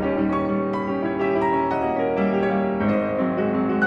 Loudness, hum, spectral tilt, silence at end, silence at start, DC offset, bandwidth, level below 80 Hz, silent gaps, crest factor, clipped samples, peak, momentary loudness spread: -22 LUFS; none; -9 dB/octave; 0 s; 0 s; under 0.1%; 6 kHz; -50 dBFS; none; 14 dB; under 0.1%; -8 dBFS; 3 LU